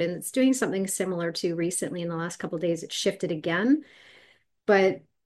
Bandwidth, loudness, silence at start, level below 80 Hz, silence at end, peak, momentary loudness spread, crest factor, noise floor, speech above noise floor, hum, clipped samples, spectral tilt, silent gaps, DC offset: 12.5 kHz; -27 LUFS; 0 s; -74 dBFS; 0.3 s; -8 dBFS; 9 LU; 20 dB; -60 dBFS; 34 dB; none; under 0.1%; -4.5 dB/octave; none; under 0.1%